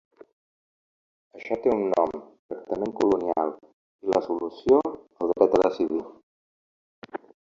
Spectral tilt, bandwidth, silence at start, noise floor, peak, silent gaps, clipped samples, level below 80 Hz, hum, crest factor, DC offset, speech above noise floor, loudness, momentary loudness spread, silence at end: -7 dB/octave; 7.6 kHz; 1.35 s; under -90 dBFS; -6 dBFS; 2.39-2.49 s, 3.73-3.99 s, 6.23-7.02 s; under 0.1%; -62 dBFS; none; 22 dB; under 0.1%; over 66 dB; -25 LUFS; 19 LU; 0.25 s